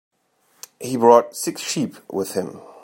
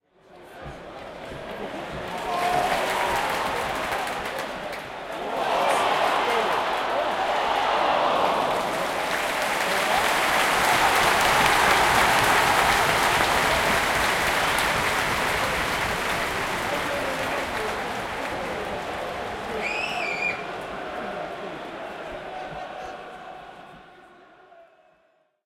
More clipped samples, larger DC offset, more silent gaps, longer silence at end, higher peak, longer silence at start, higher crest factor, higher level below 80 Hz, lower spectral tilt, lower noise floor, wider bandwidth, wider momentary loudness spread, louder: neither; neither; neither; second, 0.25 s vs 0.8 s; about the same, 0 dBFS vs -2 dBFS; first, 0.8 s vs 0.3 s; about the same, 22 dB vs 22 dB; second, -72 dBFS vs -48 dBFS; first, -4.5 dB/octave vs -2.5 dB/octave; about the same, -63 dBFS vs -65 dBFS; about the same, 16.5 kHz vs 17 kHz; about the same, 14 LU vs 16 LU; first, -20 LUFS vs -23 LUFS